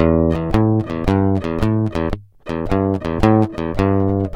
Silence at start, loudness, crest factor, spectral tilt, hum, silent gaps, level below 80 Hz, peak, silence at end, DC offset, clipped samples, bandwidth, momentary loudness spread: 0 s; -18 LUFS; 16 dB; -9 dB/octave; none; none; -30 dBFS; 0 dBFS; 0 s; under 0.1%; under 0.1%; 10.5 kHz; 8 LU